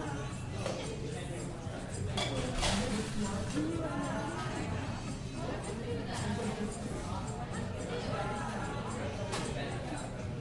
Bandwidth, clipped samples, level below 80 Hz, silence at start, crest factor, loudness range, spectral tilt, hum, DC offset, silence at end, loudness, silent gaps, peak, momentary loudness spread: 11.5 kHz; under 0.1%; -48 dBFS; 0 s; 18 dB; 3 LU; -5 dB/octave; none; under 0.1%; 0 s; -37 LUFS; none; -18 dBFS; 6 LU